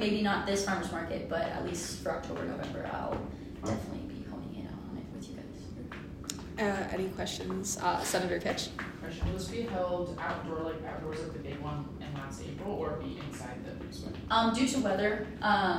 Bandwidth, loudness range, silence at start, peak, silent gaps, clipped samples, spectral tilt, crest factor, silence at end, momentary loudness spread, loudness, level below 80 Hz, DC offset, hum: 16 kHz; 6 LU; 0 s; -14 dBFS; none; under 0.1%; -4.5 dB/octave; 20 dB; 0 s; 13 LU; -35 LUFS; -52 dBFS; under 0.1%; none